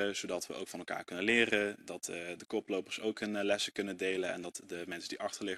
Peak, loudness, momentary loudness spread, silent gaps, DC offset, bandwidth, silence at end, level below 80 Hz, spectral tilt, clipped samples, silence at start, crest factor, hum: -14 dBFS; -36 LUFS; 13 LU; none; under 0.1%; 13.5 kHz; 0 s; -74 dBFS; -3 dB/octave; under 0.1%; 0 s; 24 dB; none